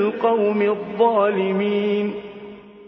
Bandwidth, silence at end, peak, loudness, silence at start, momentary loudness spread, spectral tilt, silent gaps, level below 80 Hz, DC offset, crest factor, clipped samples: 5.4 kHz; 0 s; -6 dBFS; -20 LUFS; 0 s; 18 LU; -9 dB/octave; none; -64 dBFS; under 0.1%; 16 dB; under 0.1%